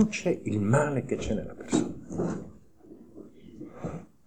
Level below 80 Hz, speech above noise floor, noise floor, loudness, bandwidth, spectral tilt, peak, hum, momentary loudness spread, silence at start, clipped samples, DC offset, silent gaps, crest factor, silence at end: -52 dBFS; 25 dB; -52 dBFS; -30 LUFS; 10 kHz; -6.5 dB/octave; -10 dBFS; none; 23 LU; 0 s; under 0.1%; 0.4%; none; 20 dB; 0 s